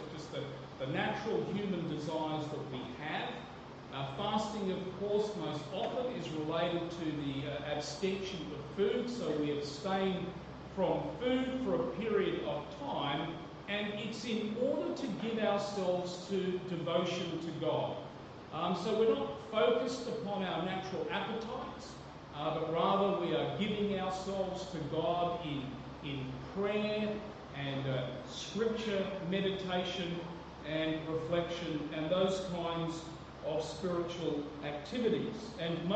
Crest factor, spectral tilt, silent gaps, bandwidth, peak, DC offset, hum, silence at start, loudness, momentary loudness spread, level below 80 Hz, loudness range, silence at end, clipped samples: 18 dB; -6 dB/octave; none; 8.8 kHz; -18 dBFS; under 0.1%; none; 0 s; -36 LUFS; 9 LU; -62 dBFS; 3 LU; 0 s; under 0.1%